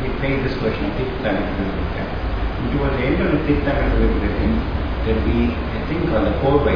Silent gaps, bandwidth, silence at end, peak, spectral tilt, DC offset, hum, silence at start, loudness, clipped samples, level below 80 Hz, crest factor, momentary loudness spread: none; 5.2 kHz; 0 s; -4 dBFS; -9 dB/octave; 1%; none; 0 s; -21 LUFS; under 0.1%; -24 dBFS; 14 dB; 6 LU